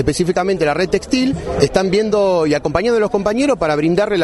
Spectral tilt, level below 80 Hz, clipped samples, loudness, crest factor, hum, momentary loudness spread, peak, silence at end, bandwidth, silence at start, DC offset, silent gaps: -5.5 dB/octave; -36 dBFS; under 0.1%; -16 LUFS; 16 dB; none; 3 LU; 0 dBFS; 0 s; 11.5 kHz; 0 s; under 0.1%; none